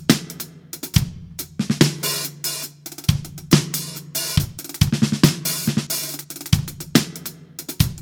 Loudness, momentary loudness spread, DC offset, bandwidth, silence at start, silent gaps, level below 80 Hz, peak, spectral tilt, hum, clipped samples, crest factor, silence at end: -22 LUFS; 15 LU; under 0.1%; over 20 kHz; 0 s; none; -38 dBFS; 0 dBFS; -4.5 dB/octave; none; under 0.1%; 22 dB; 0 s